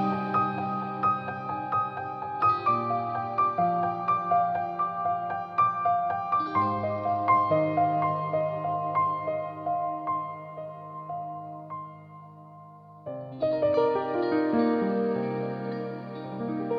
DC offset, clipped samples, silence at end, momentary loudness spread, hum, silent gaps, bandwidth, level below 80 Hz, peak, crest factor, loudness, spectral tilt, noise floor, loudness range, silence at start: under 0.1%; under 0.1%; 0 s; 15 LU; none; none; 6 kHz; -70 dBFS; -12 dBFS; 16 dB; -27 LUFS; -9 dB/octave; -48 dBFS; 8 LU; 0 s